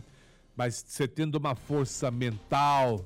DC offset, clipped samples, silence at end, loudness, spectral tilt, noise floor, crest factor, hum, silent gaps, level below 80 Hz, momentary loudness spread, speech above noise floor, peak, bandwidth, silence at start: under 0.1%; under 0.1%; 0 s; -30 LUFS; -5.5 dB/octave; -58 dBFS; 12 dB; none; none; -58 dBFS; 8 LU; 29 dB; -18 dBFS; 16 kHz; 0.55 s